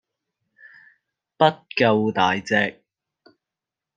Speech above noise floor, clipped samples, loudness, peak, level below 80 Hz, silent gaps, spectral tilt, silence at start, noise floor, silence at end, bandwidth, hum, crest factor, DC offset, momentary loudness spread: 68 dB; under 0.1%; -20 LUFS; -2 dBFS; -68 dBFS; none; -5.5 dB/octave; 1.4 s; -87 dBFS; 1.25 s; 9.2 kHz; none; 22 dB; under 0.1%; 3 LU